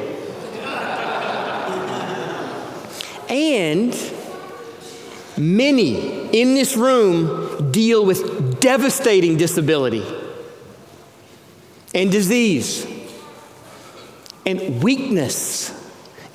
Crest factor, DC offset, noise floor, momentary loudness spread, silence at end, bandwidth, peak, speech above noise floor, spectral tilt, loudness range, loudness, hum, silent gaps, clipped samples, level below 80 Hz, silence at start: 20 dB; under 0.1%; -46 dBFS; 21 LU; 0.05 s; 16.5 kHz; 0 dBFS; 29 dB; -4.5 dB/octave; 7 LU; -19 LUFS; none; none; under 0.1%; -66 dBFS; 0 s